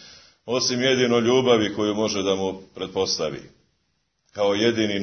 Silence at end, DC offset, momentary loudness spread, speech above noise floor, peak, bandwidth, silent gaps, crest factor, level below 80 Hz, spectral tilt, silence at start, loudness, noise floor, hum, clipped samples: 0 s; under 0.1%; 12 LU; 50 dB; -4 dBFS; 6.6 kHz; none; 18 dB; -60 dBFS; -4 dB/octave; 0 s; -22 LUFS; -72 dBFS; none; under 0.1%